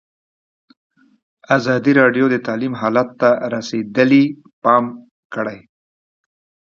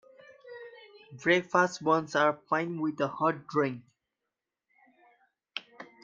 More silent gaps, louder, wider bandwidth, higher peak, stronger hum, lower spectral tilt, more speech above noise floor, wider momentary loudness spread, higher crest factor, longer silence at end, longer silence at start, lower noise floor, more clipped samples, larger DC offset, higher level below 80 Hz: first, 4.53-4.62 s, 5.11-5.30 s vs none; first, -16 LUFS vs -28 LUFS; about the same, 7.2 kHz vs 7.6 kHz; first, 0 dBFS vs -10 dBFS; neither; first, -6.5 dB/octave vs -5 dB/octave; first, over 74 dB vs 59 dB; second, 12 LU vs 22 LU; about the same, 18 dB vs 22 dB; first, 1.15 s vs 0.2 s; first, 1.5 s vs 0.45 s; about the same, under -90 dBFS vs -88 dBFS; neither; neither; first, -64 dBFS vs -76 dBFS